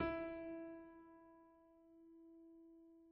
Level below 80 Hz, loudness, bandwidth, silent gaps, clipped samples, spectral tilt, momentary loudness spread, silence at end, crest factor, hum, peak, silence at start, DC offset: -70 dBFS; -52 LUFS; 5.4 kHz; none; under 0.1%; -5 dB/octave; 20 LU; 0 s; 22 dB; none; -30 dBFS; 0 s; under 0.1%